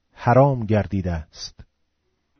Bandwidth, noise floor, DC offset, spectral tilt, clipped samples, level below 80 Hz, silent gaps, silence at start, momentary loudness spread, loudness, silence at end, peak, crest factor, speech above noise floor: 6.6 kHz; -71 dBFS; under 0.1%; -7 dB/octave; under 0.1%; -42 dBFS; none; 0.2 s; 19 LU; -20 LUFS; 0.75 s; -4 dBFS; 18 dB; 51 dB